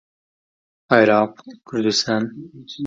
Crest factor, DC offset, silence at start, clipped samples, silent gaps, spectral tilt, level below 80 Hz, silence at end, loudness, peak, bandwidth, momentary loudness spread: 22 dB; under 0.1%; 0.9 s; under 0.1%; none; -4 dB/octave; -64 dBFS; 0 s; -19 LUFS; 0 dBFS; 9.2 kHz; 17 LU